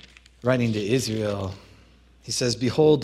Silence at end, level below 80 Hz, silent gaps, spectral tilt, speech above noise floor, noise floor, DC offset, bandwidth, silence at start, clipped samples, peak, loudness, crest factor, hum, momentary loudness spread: 0 s; -54 dBFS; none; -5 dB/octave; 31 dB; -54 dBFS; under 0.1%; 14.5 kHz; 0.45 s; under 0.1%; -6 dBFS; -24 LUFS; 18 dB; none; 14 LU